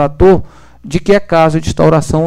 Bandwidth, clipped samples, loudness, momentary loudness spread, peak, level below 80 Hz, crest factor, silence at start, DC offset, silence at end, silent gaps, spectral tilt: 12.5 kHz; under 0.1%; -11 LUFS; 7 LU; 0 dBFS; -28 dBFS; 10 dB; 0 s; under 0.1%; 0 s; none; -7 dB/octave